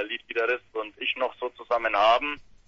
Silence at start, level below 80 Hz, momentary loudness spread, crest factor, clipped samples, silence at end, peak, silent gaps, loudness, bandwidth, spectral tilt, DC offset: 0 s; -58 dBFS; 11 LU; 18 dB; under 0.1%; 0.25 s; -8 dBFS; none; -26 LUFS; 7.2 kHz; -3 dB/octave; under 0.1%